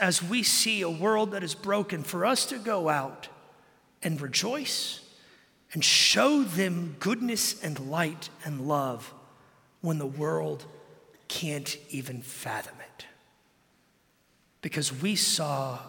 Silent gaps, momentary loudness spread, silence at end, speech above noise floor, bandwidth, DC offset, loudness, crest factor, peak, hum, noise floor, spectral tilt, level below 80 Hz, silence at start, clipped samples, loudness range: none; 17 LU; 0 s; 39 dB; 17 kHz; under 0.1%; -27 LUFS; 22 dB; -8 dBFS; none; -67 dBFS; -3 dB/octave; -74 dBFS; 0 s; under 0.1%; 12 LU